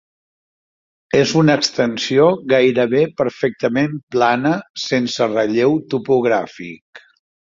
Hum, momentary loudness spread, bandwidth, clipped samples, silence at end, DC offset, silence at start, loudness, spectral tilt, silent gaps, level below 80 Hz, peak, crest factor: none; 7 LU; 7.8 kHz; under 0.1%; 0.6 s; under 0.1%; 1.15 s; -17 LUFS; -5.5 dB/octave; 4.03-4.07 s, 4.70-4.74 s, 6.81-6.93 s; -58 dBFS; -2 dBFS; 16 dB